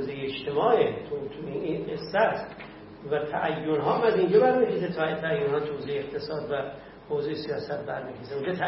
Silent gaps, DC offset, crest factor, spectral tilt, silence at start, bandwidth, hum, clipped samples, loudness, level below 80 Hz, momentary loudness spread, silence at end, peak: none; under 0.1%; 18 dB; -10 dB/octave; 0 s; 5.8 kHz; none; under 0.1%; -27 LUFS; -60 dBFS; 12 LU; 0 s; -8 dBFS